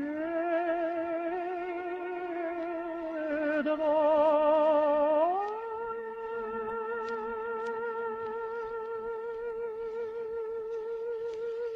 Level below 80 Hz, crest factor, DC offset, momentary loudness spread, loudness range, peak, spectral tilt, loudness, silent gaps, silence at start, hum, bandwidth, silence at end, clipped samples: -66 dBFS; 16 dB; under 0.1%; 12 LU; 9 LU; -16 dBFS; -6.5 dB/octave; -31 LUFS; none; 0 s; none; 6.4 kHz; 0 s; under 0.1%